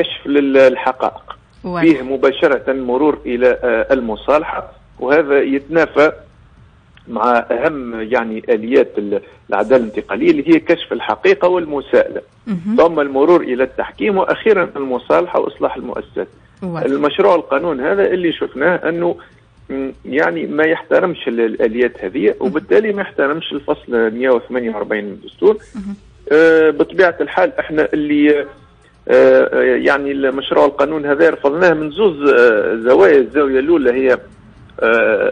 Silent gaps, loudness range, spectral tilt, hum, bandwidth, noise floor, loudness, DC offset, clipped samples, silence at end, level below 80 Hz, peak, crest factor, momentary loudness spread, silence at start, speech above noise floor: none; 5 LU; -6.5 dB/octave; none; 8.2 kHz; -46 dBFS; -15 LUFS; under 0.1%; under 0.1%; 0 s; -48 dBFS; -2 dBFS; 14 dB; 11 LU; 0 s; 31 dB